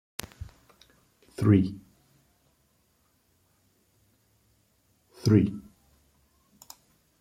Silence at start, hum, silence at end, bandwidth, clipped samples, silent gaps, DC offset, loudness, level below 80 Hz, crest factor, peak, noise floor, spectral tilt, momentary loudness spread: 0.4 s; none; 1.6 s; 15.5 kHz; under 0.1%; none; under 0.1%; -26 LUFS; -58 dBFS; 26 dB; -6 dBFS; -69 dBFS; -7.5 dB/octave; 27 LU